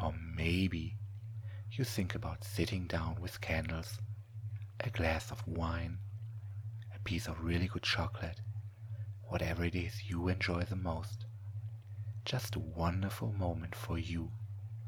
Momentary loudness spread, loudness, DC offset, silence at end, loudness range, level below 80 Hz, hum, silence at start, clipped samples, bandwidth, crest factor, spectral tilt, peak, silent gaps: 11 LU; -39 LUFS; under 0.1%; 0 s; 2 LU; -50 dBFS; none; 0 s; under 0.1%; 19 kHz; 20 dB; -6 dB/octave; -18 dBFS; none